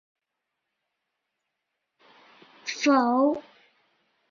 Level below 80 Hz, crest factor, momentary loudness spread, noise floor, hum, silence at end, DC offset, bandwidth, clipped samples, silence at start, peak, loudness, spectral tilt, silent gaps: -78 dBFS; 20 dB; 14 LU; -84 dBFS; none; 0.9 s; under 0.1%; 7.2 kHz; under 0.1%; 2.65 s; -10 dBFS; -24 LUFS; -3 dB/octave; none